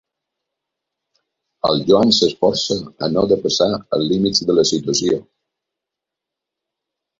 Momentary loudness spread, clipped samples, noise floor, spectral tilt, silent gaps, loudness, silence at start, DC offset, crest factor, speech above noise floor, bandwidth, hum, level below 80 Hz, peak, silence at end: 7 LU; under 0.1%; -84 dBFS; -4.5 dB/octave; none; -17 LUFS; 1.65 s; under 0.1%; 18 dB; 67 dB; 7.8 kHz; none; -52 dBFS; 0 dBFS; 2 s